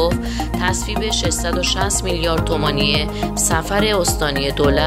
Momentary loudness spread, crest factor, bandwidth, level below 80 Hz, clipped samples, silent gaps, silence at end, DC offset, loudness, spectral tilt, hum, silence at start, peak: 3 LU; 16 dB; 16 kHz; -26 dBFS; under 0.1%; none; 0 s; under 0.1%; -18 LUFS; -3.5 dB/octave; none; 0 s; -2 dBFS